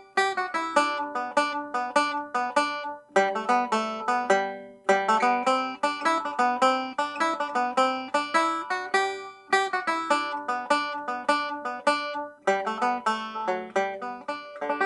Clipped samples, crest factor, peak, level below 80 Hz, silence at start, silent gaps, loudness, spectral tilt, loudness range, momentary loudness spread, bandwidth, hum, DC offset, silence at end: under 0.1%; 20 dB; -6 dBFS; -76 dBFS; 0 s; none; -26 LUFS; -2.5 dB/octave; 3 LU; 7 LU; 11.5 kHz; none; under 0.1%; 0 s